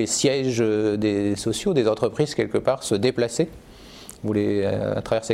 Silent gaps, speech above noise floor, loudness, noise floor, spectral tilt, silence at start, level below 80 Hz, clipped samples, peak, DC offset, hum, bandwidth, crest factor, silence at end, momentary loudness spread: none; 21 dB; -23 LUFS; -43 dBFS; -5 dB/octave; 0 s; -52 dBFS; under 0.1%; -6 dBFS; under 0.1%; none; 15.5 kHz; 16 dB; 0 s; 5 LU